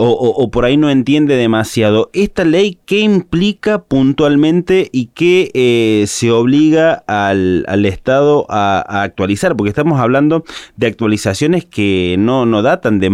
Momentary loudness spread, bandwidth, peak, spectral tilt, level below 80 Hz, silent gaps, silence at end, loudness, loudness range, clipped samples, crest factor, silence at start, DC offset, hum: 4 LU; 14.5 kHz; -2 dBFS; -6 dB/octave; -40 dBFS; none; 0 s; -12 LUFS; 2 LU; under 0.1%; 10 dB; 0 s; under 0.1%; none